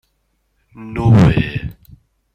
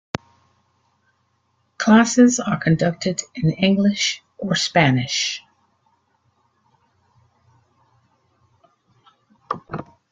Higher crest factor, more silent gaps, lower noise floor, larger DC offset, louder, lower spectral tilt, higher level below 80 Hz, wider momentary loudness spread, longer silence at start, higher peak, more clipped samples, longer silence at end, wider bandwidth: about the same, 16 dB vs 20 dB; neither; about the same, -65 dBFS vs -67 dBFS; neither; first, -14 LUFS vs -19 LUFS; first, -8.5 dB/octave vs -4.5 dB/octave; first, -34 dBFS vs -56 dBFS; first, 21 LU vs 17 LU; second, 0.8 s vs 1.8 s; about the same, 0 dBFS vs -2 dBFS; neither; first, 0.65 s vs 0.3 s; second, 8 kHz vs 9.4 kHz